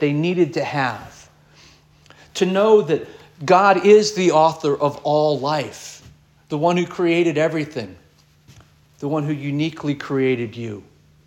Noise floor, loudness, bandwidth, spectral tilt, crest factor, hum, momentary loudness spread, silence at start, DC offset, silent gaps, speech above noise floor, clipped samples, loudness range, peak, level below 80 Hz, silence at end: -53 dBFS; -19 LUFS; 12 kHz; -5.5 dB/octave; 18 dB; none; 18 LU; 0 s; under 0.1%; none; 34 dB; under 0.1%; 8 LU; -2 dBFS; -60 dBFS; 0.45 s